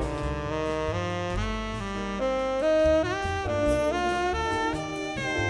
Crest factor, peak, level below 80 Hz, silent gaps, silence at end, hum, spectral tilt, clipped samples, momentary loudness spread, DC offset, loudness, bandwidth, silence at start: 14 dB; -12 dBFS; -38 dBFS; none; 0 s; none; -5.5 dB/octave; under 0.1%; 8 LU; under 0.1%; -27 LUFS; 11 kHz; 0 s